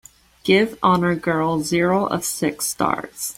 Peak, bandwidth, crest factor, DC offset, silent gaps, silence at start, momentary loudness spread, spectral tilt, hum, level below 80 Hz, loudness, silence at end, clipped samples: -2 dBFS; 16.5 kHz; 18 dB; under 0.1%; none; 0.45 s; 5 LU; -4.5 dB/octave; none; -52 dBFS; -20 LUFS; 0.05 s; under 0.1%